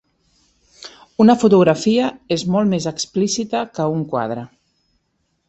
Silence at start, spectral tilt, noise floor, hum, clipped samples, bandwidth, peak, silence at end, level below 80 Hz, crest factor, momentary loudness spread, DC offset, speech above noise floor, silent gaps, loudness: 0.85 s; -5.5 dB/octave; -69 dBFS; none; under 0.1%; 8.2 kHz; -2 dBFS; 1 s; -58 dBFS; 16 dB; 17 LU; under 0.1%; 52 dB; none; -17 LUFS